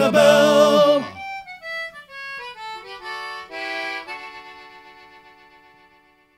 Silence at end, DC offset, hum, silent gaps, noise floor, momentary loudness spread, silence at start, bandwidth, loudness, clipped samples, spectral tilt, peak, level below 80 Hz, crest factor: 1.6 s; under 0.1%; none; none; -56 dBFS; 21 LU; 0 s; 15.5 kHz; -19 LUFS; under 0.1%; -4 dB/octave; -2 dBFS; -66 dBFS; 18 dB